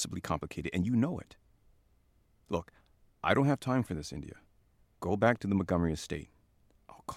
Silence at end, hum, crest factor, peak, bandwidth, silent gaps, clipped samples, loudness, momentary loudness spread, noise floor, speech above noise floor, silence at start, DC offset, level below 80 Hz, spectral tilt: 0 s; none; 22 dB; -12 dBFS; 15.5 kHz; none; under 0.1%; -32 LUFS; 14 LU; -68 dBFS; 37 dB; 0 s; under 0.1%; -54 dBFS; -6 dB/octave